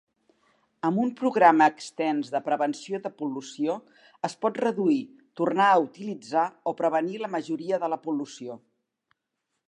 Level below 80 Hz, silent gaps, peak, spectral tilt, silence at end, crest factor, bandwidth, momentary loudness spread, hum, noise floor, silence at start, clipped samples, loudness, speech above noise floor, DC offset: -84 dBFS; none; -4 dBFS; -5.5 dB/octave; 1.1 s; 22 dB; 10.5 kHz; 14 LU; none; -81 dBFS; 0.85 s; under 0.1%; -26 LUFS; 56 dB; under 0.1%